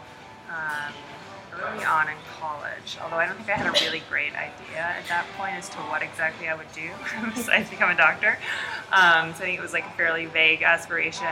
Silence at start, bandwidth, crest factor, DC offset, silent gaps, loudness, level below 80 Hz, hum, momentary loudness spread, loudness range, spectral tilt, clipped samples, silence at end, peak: 0 s; 16 kHz; 22 dB; under 0.1%; none; -24 LUFS; -64 dBFS; none; 15 LU; 8 LU; -2.5 dB/octave; under 0.1%; 0 s; -4 dBFS